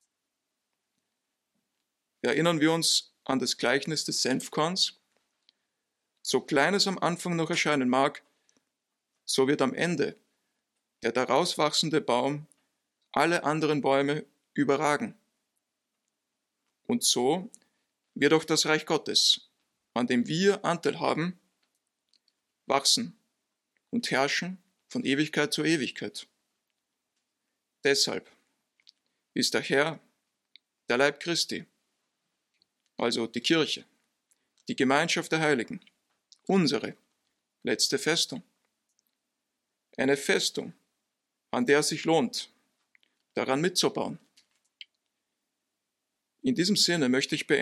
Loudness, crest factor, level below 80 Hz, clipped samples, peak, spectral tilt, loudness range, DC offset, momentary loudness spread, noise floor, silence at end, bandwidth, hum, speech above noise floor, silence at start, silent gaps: -27 LUFS; 22 dB; -78 dBFS; under 0.1%; -8 dBFS; -3.5 dB/octave; 5 LU; under 0.1%; 14 LU; -84 dBFS; 0 s; 16 kHz; none; 57 dB; 2.25 s; none